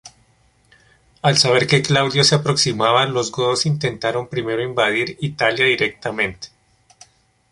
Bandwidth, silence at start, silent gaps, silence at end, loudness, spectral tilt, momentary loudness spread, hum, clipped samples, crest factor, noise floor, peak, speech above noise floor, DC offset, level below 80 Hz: 11.5 kHz; 0.05 s; none; 1.05 s; -17 LUFS; -4 dB/octave; 9 LU; none; under 0.1%; 18 dB; -58 dBFS; -2 dBFS; 40 dB; under 0.1%; -54 dBFS